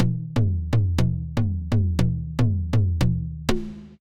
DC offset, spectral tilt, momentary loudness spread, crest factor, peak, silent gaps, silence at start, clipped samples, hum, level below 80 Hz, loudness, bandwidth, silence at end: under 0.1%; -7.5 dB/octave; 5 LU; 14 dB; -8 dBFS; none; 0 s; under 0.1%; none; -32 dBFS; -24 LUFS; 15.5 kHz; 0.05 s